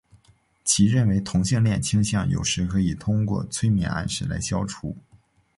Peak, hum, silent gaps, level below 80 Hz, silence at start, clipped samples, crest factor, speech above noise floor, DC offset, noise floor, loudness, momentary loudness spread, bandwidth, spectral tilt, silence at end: -6 dBFS; none; none; -42 dBFS; 0.65 s; under 0.1%; 16 dB; 37 dB; under 0.1%; -60 dBFS; -23 LUFS; 9 LU; 11.5 kHz; -5 dB/octave; 0.6 s